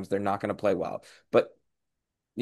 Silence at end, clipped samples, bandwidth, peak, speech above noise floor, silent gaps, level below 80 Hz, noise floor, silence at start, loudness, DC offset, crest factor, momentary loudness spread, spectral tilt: 0 s; under 0.1%; 12.5 kHz; -10 dBFS; 56 dB; none; -68 dBFS; -84 dBFS; 0 s; -29 LUFS; under 0.1%; 20 dB; 14 LU; -7 dB/octave